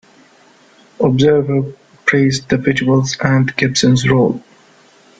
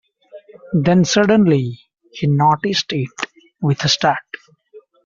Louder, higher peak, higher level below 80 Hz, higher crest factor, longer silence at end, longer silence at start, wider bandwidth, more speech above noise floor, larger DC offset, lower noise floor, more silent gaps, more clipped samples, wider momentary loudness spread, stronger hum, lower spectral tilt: first, -14 LUFS vs -17 LUFS; about the same, 0 dBFS vs -2 dBFS; first, -48 dBFS vs -54 dBFS; about the same, 14 dB vs 16 dB; first, 0.8 s vs 0.25 s; first, 1 s vs 0.35 s; first, 9.2 kHz vs 7.6 kHz; first, 35 dB vs 31 dB; neither; about the same, -48 dBFS vs -46 dBFS; neither; neither; second, 6 LU vs 14 LU; neither; about the same, -5.5 dB/octave vs -5 dB/octave